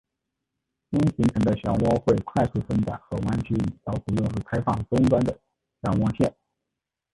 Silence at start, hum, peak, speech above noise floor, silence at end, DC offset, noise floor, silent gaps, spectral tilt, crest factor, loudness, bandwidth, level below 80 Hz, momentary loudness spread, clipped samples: 0.9 s; none; -6 dBFS; 62 dB; 0.85 s; under 0.1%; -85 dBFS; none; -8.5 dB/octave; 18 dB; -25 LUFS; 11.5 kHz; -44 dBFS; 8 LU; under 0.1%